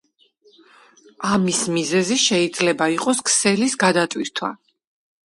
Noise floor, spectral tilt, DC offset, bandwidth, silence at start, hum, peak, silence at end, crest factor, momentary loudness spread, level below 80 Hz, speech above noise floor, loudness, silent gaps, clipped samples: -58 dBFS; -3 dB/octave; under 0.1%; 11.5 kHz; 1.2 s; none; -2 dBFS; 0.7 s; 20 dB; 9 LU; -62 dBFS; 38 dB; -19 LUFS; none; under 0.1%